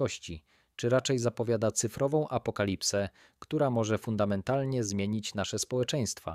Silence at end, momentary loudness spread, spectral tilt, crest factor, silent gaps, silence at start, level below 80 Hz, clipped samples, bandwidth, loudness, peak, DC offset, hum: 0 s; 7 LU; -5 dB/octave; 16 dB; none; 0 s; -60 dBFS; under 0.1%; 15.5 kHz; -31 LUFS; -14 dBFS; under 0.1%; none